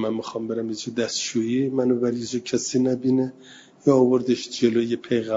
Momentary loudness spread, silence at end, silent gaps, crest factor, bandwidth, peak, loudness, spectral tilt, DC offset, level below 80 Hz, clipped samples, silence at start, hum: 9 LU; 0 s; none; 18 dB; 7.8 kHz; -4 dBFS; -23 LUFS; -5 dB/octave; under 0.1%; -66 dBFS; under 0.1%; 0 s; none